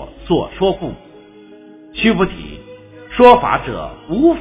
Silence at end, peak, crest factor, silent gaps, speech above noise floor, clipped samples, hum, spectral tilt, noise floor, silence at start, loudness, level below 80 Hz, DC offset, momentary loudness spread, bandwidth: 0 s; 0 dBFS; 16 dB; none; 27 dB; 0.3%; none; -10 dB/octave; -41 dBFS; 0 s; -15 LUFS; -38 dBFS; under 0.1%; 21 LU; 4 kHz